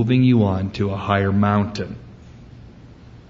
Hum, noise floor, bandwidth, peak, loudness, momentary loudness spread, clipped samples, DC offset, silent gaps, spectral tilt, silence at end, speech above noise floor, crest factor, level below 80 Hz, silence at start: none; -43 dBFS; 7.6 kHz; -2 dBFS; -19 LUFS; 15 LU; under 0.1%; under 0.1%; none; -8.5 dB/octave; 0.1 s; 24 dB; 18 dB; -48 dBFS; 0 s